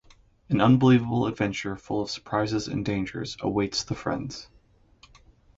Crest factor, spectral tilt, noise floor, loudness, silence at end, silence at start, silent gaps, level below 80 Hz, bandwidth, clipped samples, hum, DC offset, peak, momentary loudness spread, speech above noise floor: 18 dB; -6 dB/octave; -59 dBFS; -26 LUFS; 1.15 s; 0.5 s; none; -52 dBFS; 7.8 kHz; under 0.1%; none; under 0.1%; -8 dBFS; 13 LU; 34 dB